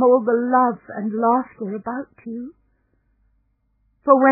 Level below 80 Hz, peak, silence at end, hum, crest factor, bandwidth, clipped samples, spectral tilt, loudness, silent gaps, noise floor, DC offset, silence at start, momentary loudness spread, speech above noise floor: -66 dBFS; 0 dBFS; 0 s; none; 20 dB; 2.6 kHz; under 0.1%; -13.5 dB/octave; -20 LUFS; none; -66 dBFS; under 0.1%; 0 s; 17 LU; 47 dB